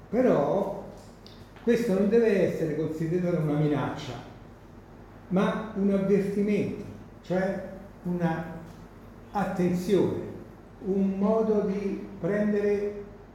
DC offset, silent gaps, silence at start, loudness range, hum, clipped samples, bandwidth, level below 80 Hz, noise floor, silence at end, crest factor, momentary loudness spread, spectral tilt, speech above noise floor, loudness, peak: under 0.1%; none; 0 s; 4 LU; none; under 0.1%; 15 kHz; -54 dBFS; -48 dBFS; 0 s; 16 dB; 19 LU; -8 dB/octave; 22 dB; -27 LUFS; -12 dBFS